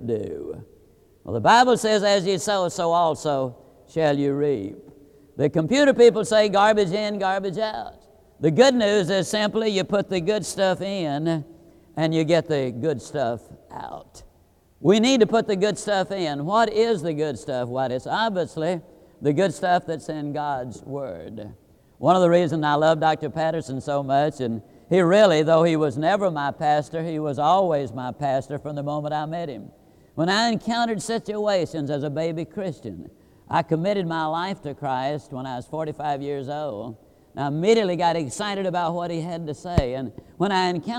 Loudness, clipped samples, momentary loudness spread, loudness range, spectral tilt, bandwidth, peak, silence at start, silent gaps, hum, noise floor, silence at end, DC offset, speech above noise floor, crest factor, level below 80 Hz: -22 LUFS; under 0.1%; 15 LU; 6 LU; -5.5 dB/octave; 14.5 kHz; -4 dBFS; 0 s; none; none; -58 dBFS; 0 s; under 0.1%; 36 dB; 20 dB; -52 dBFS